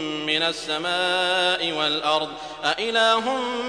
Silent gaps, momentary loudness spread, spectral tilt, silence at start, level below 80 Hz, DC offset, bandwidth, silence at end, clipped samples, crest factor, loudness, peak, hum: none; 6 LU; -2.5 dB/octave; 0 s; -58 dBFS; under 0.1%; 10.5 kHz; 0 s; under 0.1%; 18 dB; -22 LUFS; -4 dBFS; none